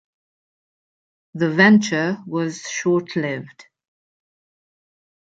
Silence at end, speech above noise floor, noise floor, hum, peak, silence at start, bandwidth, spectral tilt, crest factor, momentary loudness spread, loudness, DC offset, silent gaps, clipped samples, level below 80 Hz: 1.7 s; over 71 dB; under -90 dBFS; none; -2 dBFS; 1.35 s; 7.8 kHz; -5.5 dB/octave; 20 dB; 13 LU; -19 LUFS; under 0.1%; none; under 0.1%; -68 dBFS